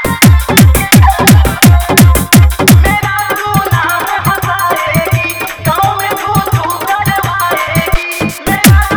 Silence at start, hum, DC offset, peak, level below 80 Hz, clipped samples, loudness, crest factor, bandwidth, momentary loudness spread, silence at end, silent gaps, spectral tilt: 0 s; none; under 0.1%; 0 dBFS; -16 dBFS; 2%; -9 LUFS; 8 dB; over 20 kHz; 8 LU; 0 s; none; -4.5 dB/octave